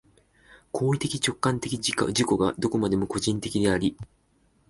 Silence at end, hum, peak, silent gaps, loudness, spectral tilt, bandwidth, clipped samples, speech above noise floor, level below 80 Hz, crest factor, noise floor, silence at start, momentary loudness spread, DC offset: 0.65 s; none; -8 dBFS; none; -26 LUFS; -4.5 dB/octave; 11.5 kHz; under 0.1%; 40 dB; -52 dBFS; 18 dB; -65 dBFS; 0.75 s; 6 LU; under 0.1%